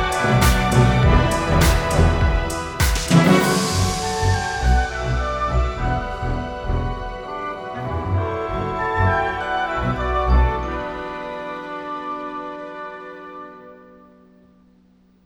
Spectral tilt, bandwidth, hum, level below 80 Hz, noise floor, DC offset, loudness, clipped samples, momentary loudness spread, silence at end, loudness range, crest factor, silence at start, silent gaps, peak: -5.5 dB/octave; over 20 kHz; none; -26 dBFS; -55 dBFS; under 0.1%; -20 LUFS; under 0.1%; 14 LU; 1.5 s; 14 LU; 18 dB; 0 s; none; -2 dBFS